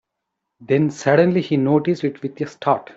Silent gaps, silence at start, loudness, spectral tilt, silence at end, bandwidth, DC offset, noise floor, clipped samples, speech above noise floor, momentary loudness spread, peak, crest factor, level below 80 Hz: none; 0.6 s; -19 LUFS; -7 dB/octave; 0.05 s; 8 kHz; under 0.1%; -79 dBFS; under 0.1%; 61 dB; 9 LU; -2 dBFS; 16 dB; -62 dBFS